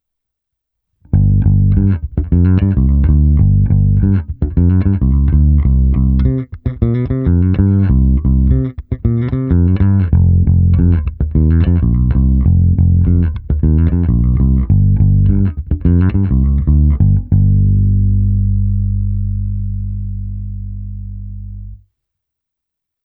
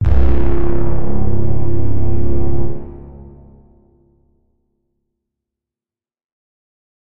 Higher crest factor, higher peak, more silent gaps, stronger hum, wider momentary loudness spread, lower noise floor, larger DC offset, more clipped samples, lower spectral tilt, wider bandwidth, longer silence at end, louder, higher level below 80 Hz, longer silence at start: about the same, 12 dB vs 12 dB; about the same, 0 dBFS vs 0 dBFS; second, none vs 6.24-6.29 s; neither; second, 10 LU vs 20 LU; second, -80 dBFS vs under -90 dBFS; neither; neither; first, -14 dB/octave vs -11.5 dB/octave; second, 3 kHz vs 4.1 kHz; first, 1.3 s vs 0.7 s; first, -13 LUFS vs -20 LUFS; first, -16 dBFS vs -24 dBFS; first, 1.15 s vs 0 s